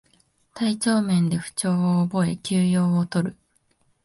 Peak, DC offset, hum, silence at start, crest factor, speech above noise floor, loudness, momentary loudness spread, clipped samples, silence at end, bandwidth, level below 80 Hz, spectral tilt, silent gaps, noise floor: -8 dBFS; under 0.1%; none; 0.55 s; 14 dB; 44 dB; -23 LUFS; 6 LU; under 0.1%; 0.7 s; 11.5 kHz; -60 dBFS; -6 dB/octave; none; -66 dBFS